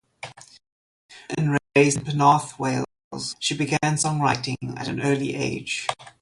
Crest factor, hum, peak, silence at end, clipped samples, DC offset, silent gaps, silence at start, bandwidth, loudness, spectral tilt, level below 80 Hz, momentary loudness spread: 20 dB; none; -4 dBFS; 0.1 s; under 0.1%; under 0.1%; 0.72-1.09 s, 3.04-3.11 s; 0.25 s; 11.5 kHz; -23 LUFS; -4.5 dB/octave; -58 dBFS; 13 LU